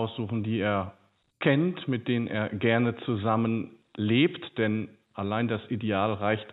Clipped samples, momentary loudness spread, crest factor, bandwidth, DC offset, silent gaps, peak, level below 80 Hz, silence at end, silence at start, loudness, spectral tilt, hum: under 0.1%; 8 LU; 18 dB; 4.1 kHz; under 0.1%; none; -10 dBFS; -68 dBFS; 0 s; 0 s; -28 LUFS; -10 dB/octave; none